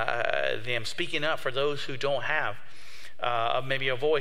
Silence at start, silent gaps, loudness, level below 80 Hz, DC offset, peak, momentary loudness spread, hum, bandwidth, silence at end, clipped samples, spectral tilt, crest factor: 0 s; none; -29 LUFS; -62 dBFS; 3%; -8 dBFS; 10 LU; none; 15.5 kHz; 0 s; under 0.1%; -4 dB/octave; 22 dB